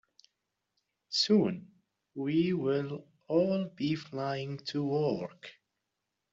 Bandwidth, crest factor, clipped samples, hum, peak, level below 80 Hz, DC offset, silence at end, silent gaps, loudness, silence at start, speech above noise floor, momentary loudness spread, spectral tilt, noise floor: 7.8 kHz; 18 dB; under 0.1%; none; -14 dBFS; -72 dBFS; under 0.1%; 0.8 s; none; -31 LUFS; 1.1 s; 55 dB; 17 LU; -5.5 dB/octave; -85 dBFS